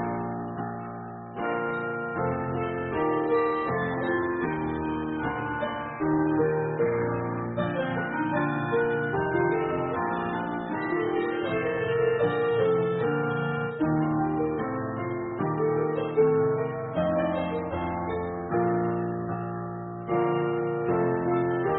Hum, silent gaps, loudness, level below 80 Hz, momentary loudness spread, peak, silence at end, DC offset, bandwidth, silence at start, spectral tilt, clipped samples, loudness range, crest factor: none; none; -28 LUFS; -54 dBFS; 7 LU; -12 dBFS; 0 s; under 0.1%; 4 kHz; 0 s; -6.5 dB/octave; under 0.1%; 3 LU; 16 dB